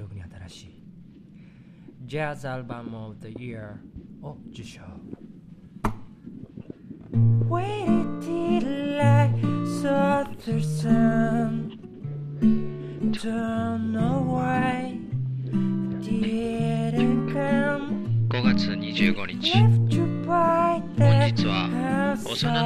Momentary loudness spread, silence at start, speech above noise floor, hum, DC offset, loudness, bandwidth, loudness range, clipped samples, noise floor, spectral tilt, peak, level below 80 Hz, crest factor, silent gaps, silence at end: 21 LU; 0 s; 24 dB; none; under 0.1%; -24 LUFS; 11 kHz; 15 LU; under 0.1%; -48 dBFS; -7 dB/octave; -6 dBFS; -50 dBFS; 18 dB; none; 0 s